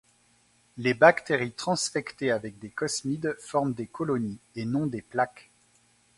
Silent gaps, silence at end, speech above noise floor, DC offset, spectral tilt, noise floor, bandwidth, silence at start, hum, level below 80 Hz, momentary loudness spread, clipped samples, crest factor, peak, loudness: none; 0.75 s; 37 dB; under 0.1%; -4.5 dB/octave; -64 dBFS; 11.5 kHz; 0.75 s; none; -66 dBFS; 12 LU; under 0.1%; 26 dB; -4 dBFS; -27 LUFS